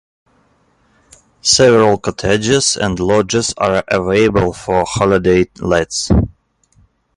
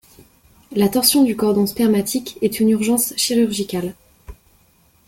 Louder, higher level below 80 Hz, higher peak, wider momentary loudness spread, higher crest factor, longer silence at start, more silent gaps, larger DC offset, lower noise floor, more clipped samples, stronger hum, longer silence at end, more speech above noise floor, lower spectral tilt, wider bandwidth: first, -14 LUFS vs -18 LUFS; first, -32 dBFS vs -50 dBFS; about the same, 0 dBFS vs 0 dBFS; second, 7 LU vs 10 LU; about the same, 14 dB vs 18 dB; first, 1.45 s vs 0.7 s; neither; neither; about the same, -56 dBFS vs -56 dBFS; neither; neither; first, 0.9 s vs 0.75 s; first, 43 dB vs 39 dB; about the same, -4 dB/octave vs -4 dB/octave; second, 11.5 kHz vs 17 kHz